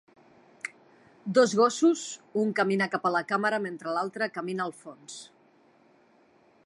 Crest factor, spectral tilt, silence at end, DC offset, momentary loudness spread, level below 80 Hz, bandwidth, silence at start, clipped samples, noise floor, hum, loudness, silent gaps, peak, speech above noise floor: 20 dB; -4.5 dB/octave; 1.4 s; under 0.1%; 19 LU; -82 dBFS; 11.5 kHz; 0.65 s; under 0.1%; -62 dBFS; none; -27 LUFS; none; -10 dBFS; 35 dB